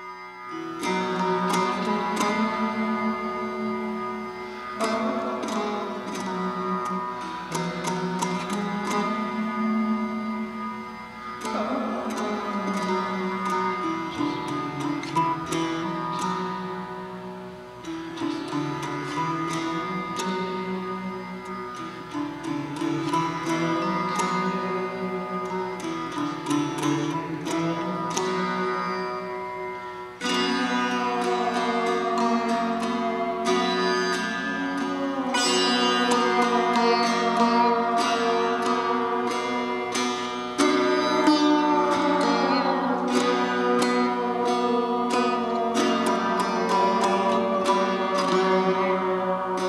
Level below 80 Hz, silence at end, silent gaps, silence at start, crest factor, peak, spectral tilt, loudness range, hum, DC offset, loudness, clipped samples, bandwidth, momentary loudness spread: -62 dBFS; 0 s; none; 0 s; 18 dB; -6 dBFS; -4.5 dB/octave; 7 LU; none; under 0.1%; -25 LUFS; under 0.1%; 13.5 kHz; 11 LU